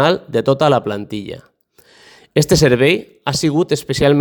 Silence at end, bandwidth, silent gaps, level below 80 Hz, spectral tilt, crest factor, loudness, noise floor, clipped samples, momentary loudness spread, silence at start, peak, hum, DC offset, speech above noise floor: 0 s; over 20 kHz; none; -42 dBFS; -5 dB/octave; 16 dB; -15 LUFS; -50 dBFS; under 0.1%; 14 LU; 0 s; 0 dBFS; none; under 0.1%; 36 dB